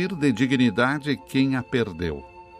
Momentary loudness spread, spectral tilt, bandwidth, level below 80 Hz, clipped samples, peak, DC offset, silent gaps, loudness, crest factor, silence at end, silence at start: 10 LU; -6.5 dB/octave; 14 kHz; -52 dBFS; under 0.1%; -8 dBFS; under 0.1%; none; -23 LUFS; 16 dB; 0 s; 0 s